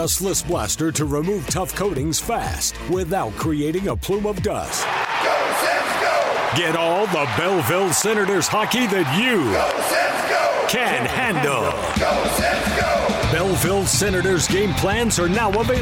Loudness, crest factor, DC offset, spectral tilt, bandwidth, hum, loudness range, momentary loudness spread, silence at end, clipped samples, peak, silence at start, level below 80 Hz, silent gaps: -20 LUFS; 14 dB; under 0.1%; -3.5 dB/octave; 17 kHz; none; 4 LU; 5 LU; 0 s; under 0.1%; -6 dBFS; 0 s; -38 dBFS; none